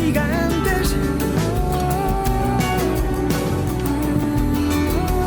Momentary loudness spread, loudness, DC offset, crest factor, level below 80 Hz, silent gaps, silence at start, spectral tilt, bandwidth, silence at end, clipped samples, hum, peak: 2 LU; -20 LUFS; under 0.1%; 12 dB; -26 dBFS; none; 0 s; -6 dB/octave; over 20 kHz; 0 s; under 0.1%; none; -6 dBFS